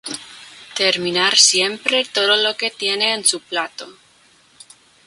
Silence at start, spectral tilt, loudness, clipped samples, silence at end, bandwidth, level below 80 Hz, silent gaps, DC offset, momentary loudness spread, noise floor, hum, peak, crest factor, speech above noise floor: 0.05 s; 0 dB/octave; -16 LUFS; under 0.1%; 1.15 s; 16 kHz; -68 dBFS; none; under 0.1%; 19 LU; -53 dBFS; none; 0 dBFS; 20 dB; 35 dB